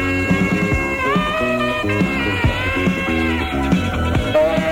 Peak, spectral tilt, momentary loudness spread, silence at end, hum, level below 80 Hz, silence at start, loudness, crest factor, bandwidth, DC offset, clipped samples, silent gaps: -4 dBFS; -6 dB/octave; 2 LU; 0 s; none; -30 dBFS; 0 s; -18 LUFS; 14 dB; 16.5 kHz; under 0.1%; under 0.1%; none